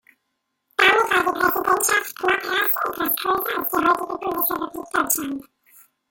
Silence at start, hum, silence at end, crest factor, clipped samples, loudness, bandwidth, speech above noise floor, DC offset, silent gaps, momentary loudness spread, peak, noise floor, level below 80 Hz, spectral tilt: 0.8 s; none; 0.7 s; 18 dB; under 0.1%; -20 LUFS; 17 kHz; 54 dB; under 0.1%; none; 9 LU; -4 dBFS; -76 dBFS; -58 dBFS; -1.5 dB/octave